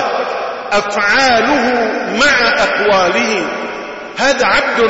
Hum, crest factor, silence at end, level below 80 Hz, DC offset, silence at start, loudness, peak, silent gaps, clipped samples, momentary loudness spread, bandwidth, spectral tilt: none; 12 dB; 0 s; -44 dBFS; under 0.1%; 0 s; -12 LUFS; -2 dBFS; none; under 0.1%; 11 LU; 8 kHz; -2.5 dB/octave